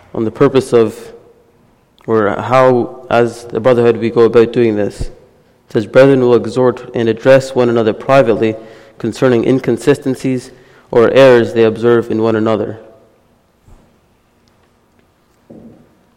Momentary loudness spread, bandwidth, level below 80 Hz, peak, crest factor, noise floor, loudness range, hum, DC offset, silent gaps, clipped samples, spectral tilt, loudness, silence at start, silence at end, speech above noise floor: 11 LU; 12.5 kHz; -42 dBFS; 0 dBFS; 12 dB; -53 dBFS; 4 LU; none; under 0.1%; none; under 0.1%; -7 dB/octave; -12 LUFS; 0.15 s; 0.5 s; 42 dB